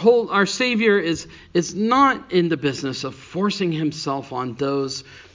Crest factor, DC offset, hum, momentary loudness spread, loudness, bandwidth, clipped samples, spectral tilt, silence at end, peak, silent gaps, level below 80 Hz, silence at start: 18 dB; under 0.1%; none; 12 LU; -21 LUFS; 7.6 kHz; under 0.1%; -5 dB/octave; 0.15 s; -2 dBFS; none; -56 dBFS; 0 s